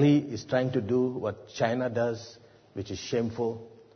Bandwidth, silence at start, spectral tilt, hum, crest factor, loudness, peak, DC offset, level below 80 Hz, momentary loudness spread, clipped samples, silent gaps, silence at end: 6.6 kHz; 0 s; -6.5 dB/octave; none; 18 dB; -29 LUFS; -12 dBFS; under 0.1%; -64 dBFS; 13 LU; under 0.1%; none; 0.25 s